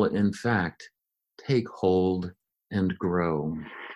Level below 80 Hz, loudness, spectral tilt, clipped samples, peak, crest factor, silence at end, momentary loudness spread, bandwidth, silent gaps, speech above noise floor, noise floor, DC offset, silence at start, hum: -50 dBFS; -27 LUFS; -7.5 dB/octave; under 0.1%; -12 dBFS; 16 dB; 0 s; 9 LU; 11.5 kHz; none; 30 dB; -57 dBFS; under 0.1%; 0 s; none